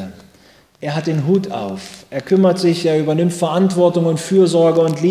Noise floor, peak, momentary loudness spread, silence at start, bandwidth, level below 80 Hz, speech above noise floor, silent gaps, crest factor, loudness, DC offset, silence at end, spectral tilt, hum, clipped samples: -49 dBFS; -2 dBFS; 14 LU; 0 s; 14 kHz; -58 dBFS; 34 dB; none; 14 dB; -16 LUFS; under 0.1%; 0 s; -6.5 dB/octave; none; under 0.1%